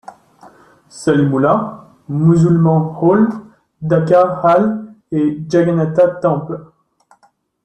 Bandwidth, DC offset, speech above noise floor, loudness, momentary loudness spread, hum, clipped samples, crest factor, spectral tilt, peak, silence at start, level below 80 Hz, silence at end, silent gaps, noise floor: 8.8 kHz; under 0.1%; 43 dB; -14 LUFS; 14 LU; none; under 0.1%; 14 dB; -8.5 dB/octave; -2 dBFS; 0.1 s; -54 dBFS; 1 s; none; -56 dBFS